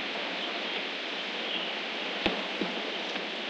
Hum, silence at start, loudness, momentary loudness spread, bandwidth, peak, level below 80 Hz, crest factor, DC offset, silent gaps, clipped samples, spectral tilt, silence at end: none; 0 s; -32 LUFS; 3 LU; 9.6 kHz; -10 dBFS; -64 dBFS; 24 dB; under 0.1%; none; under 0.1%; -3 dB/octave; 0 s